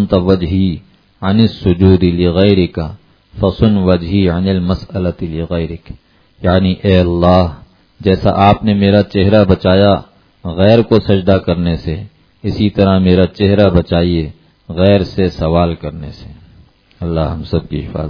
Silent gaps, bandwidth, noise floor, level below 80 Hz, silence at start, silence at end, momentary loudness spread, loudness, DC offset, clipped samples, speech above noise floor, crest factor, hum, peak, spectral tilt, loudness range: none; 5.4 kHz; -45 dBFS; -32 dBFS; 0 s; 0 s; 13 LU; -13 LUFS; under 0.1%; 0.2%; 33 dB; 12 dB; none; 0 dBFS; -9.5 dB/octave; 4 LU